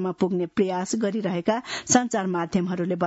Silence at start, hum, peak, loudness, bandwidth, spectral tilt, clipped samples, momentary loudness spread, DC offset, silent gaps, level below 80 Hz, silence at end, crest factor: 0 s; none; -4 dBFS; -25 LUFS; 8 kHz; -4.5 dB/octave; under 0.1%; 5 LU; under 0.1%; none; -62 dBFS; 0 s; 20 dB